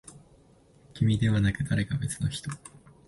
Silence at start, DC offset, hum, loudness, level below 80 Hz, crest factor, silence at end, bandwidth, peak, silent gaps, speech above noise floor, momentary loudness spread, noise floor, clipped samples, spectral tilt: 0.05 s; under 0.1%; none; -28 LUFS; -48 dBFS; 18 dB; 0.4 s; 11.5 kHz; -12 dBFS; none; 32 dB; 15 LU; -58 dBFS; under 0.1%; -6 dB/octave